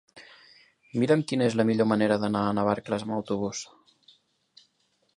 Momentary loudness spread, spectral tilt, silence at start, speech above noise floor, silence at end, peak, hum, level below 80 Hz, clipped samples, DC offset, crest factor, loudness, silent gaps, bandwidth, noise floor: 10 LU; -6 dB/octave; 0.15 s; 46 dB; 1.5 s; -8 dBFS; none; -64 dBFS; under 0.1%; under 0.1%; 20 dB; -26 LUFS; none; 11 kHz; -71 dBFS